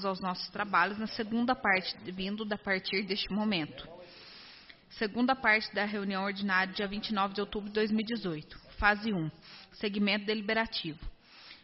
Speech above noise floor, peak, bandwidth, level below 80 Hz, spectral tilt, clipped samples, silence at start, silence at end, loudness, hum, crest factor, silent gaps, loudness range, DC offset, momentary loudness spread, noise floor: 22 dB; -12 dBFS; 6 kHz; -54 dBFS; -2.5 dB/octave; under 0.1%; 0 s; 0.05 s; -31 LUFS; none; 22 dB; none; 2 LU; under 0.1%; 21 LU; -54 dBFS